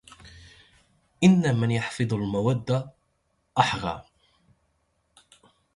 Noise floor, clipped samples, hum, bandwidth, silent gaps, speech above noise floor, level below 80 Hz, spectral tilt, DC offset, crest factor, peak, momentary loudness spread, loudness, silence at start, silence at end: -72 dBFS; under 0.1%; none; 11.5 kHz; none; 49 dB; -56 dBFS; -6.5 dB/octave; under 0.1%; 22 dB; -6 dBFS; 12 LU; -25 LUFS; 0.25 s; 1.75 s